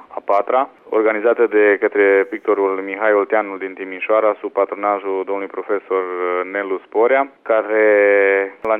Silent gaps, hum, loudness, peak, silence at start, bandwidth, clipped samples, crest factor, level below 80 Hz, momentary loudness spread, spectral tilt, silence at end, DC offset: none; none; -17 LUFS; -4 dBFS; 0.1 s; 3.9 kHz; under 0.1%; 12 dB; -70 dBFS; 9 LU; -7 dB/octave; 0 s; under 0.1%